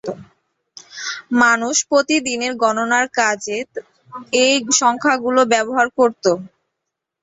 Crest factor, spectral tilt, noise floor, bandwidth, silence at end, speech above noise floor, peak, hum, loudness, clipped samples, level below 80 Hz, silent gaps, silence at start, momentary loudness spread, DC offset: 18 dB; -1.5 dB/octave; -80 dBFS; 8.2 kHz; 0.75 s; 63 dB; 0 dBFS; none; -17 LUFS; under 0.1%; -62 dBFS; none; 0.05 s; 16 LU; under 0.1%